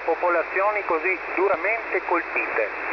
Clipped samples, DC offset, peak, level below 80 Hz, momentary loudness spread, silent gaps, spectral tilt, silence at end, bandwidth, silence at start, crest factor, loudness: under 0.1%; under 0.1%; -10 dBFS; -58 dBFS; 3 LU; none; -5.5 dB/octave; 0 s; 5.4 kHz; 0 s; 14 dB; -23 LUFS